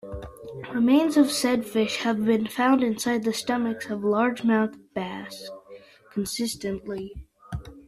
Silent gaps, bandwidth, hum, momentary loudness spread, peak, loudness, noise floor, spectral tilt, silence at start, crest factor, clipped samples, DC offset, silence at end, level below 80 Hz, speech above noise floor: none; 15 kHz; none; 18 LU; -8 dBFS; -25 LUFS; -48 dBFS; -4.5 dB/octave; 0.05 s; 18 dB; under 0.1%; under 0.1%; 0.05 s; -52 dBFS; 24 dB